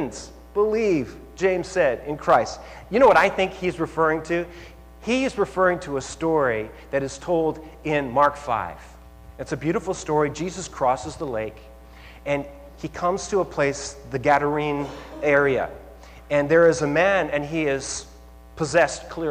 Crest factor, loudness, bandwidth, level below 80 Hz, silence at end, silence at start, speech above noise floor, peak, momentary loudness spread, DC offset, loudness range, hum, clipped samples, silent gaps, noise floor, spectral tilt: 18 dB; -23 LUFS; 15.5 kHz; -46 dBFS; 0 s; 0 s; 22 dB; -6 dBFS; 14 LU; under 0.1%; 6 LU; none; under 0.1%; none; -45 dBFS; -5 dB/octave